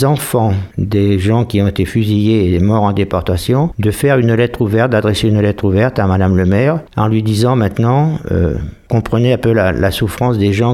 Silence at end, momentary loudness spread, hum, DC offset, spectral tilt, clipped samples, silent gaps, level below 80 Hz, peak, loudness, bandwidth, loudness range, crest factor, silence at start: 0 s; 4 LU; none; under 0.1%; -7 dB/octave; under 0.1%; none; -34 dBFS; 0 dBFS; -14 LUFS; 15.5 kHz; 1 LU; 12 dB; 0 s